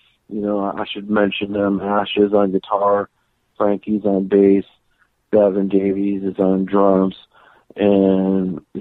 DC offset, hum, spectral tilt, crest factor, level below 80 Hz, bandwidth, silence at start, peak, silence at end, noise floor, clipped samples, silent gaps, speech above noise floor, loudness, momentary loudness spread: under 0.1%; none; -10 dB/octave; 14 dB; -54 dBFS; 4.2 kHz; 0.3 s; -2 dBFS; 0 s; -62 dBFS; under 0.1%; none; 45 dB; -18 LUFS; 8 LU